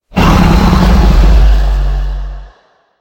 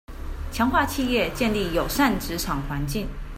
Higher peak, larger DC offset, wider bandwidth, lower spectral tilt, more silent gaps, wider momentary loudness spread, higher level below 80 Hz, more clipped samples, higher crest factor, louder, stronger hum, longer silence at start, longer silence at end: first, 0 dBFS vs -8 dBFS; neither; about the same, 16.5 kHz vs 16 kHz; first, -6.5 dB/octave vs -4.5 dB/octave; neither; first, 13 LU vs 9 LU; first, -10 dBFS vs -34 dBFS; first, 0.7% vs under 0.1%; second, 8 dB vs 18 dB; first, -10 LUFS vs -24 LUFS; neither; about the same, 0.15 s vs 0.1 s; first, 0.55 s vs 0 s